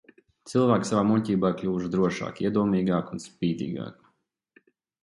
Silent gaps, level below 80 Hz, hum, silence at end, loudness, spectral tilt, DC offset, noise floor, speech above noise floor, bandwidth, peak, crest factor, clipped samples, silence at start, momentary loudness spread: none; -58 dBFS; none; 1.1 s; -26 LUFS; -7 dB/octave; under 0.1%; -70 dBFS; 45 dB; 11.5 kHz; -8 dBFS; 18 dB; under 0.1%; 0.45 s; 10 LU